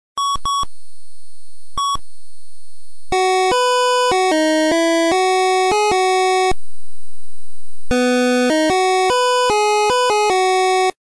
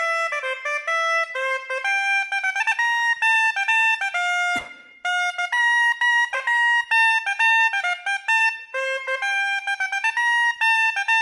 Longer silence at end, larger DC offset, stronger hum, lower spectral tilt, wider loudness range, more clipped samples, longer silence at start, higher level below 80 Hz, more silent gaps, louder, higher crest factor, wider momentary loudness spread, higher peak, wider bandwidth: about the same, 0.1 s vs 0 s; neither; neither; first, -2.5 dB/octave vs 2 dB/octave; first, 6 LU vs 2 LU; neither; first, 0.15 s vs 0 s; first, -42 dBFS vs -72 dBFS; neither; first, -16 LUFS vs -20 LUFS; second, 6 dB vs 12 dB; about the same, 7 LU vs 7 LU; about the same, -10 dBFS vs -10 dBFS; second, 11 kHz vs 12.5 kHz